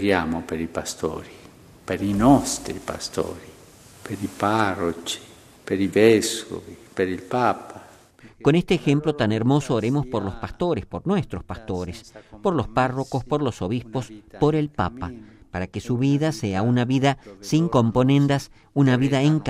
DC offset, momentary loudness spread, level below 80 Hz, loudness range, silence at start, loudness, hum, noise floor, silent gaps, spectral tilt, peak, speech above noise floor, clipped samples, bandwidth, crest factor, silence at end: under 0.1%; 16 LU; -48 dBFS; 5 LU; 0 s; -23 LUFS; none; -50 dBFS; none; -6 dB/octave; -2 dBFS; 27 dB; under 0.1%; 15 kHz; 20 dB; 0 s